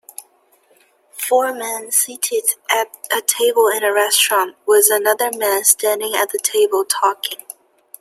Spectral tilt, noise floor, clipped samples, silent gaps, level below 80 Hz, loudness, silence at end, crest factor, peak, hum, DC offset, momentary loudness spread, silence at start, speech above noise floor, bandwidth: 1.5 dB/octave; -56 dBFS; under 0.1%; none; -76 dBFS; -16 LUFS; 0.65 s; 18 dB; 0 dBFS; none; under 0.1%; 11 LU; 0.2 s; 39 dB; 16 kHz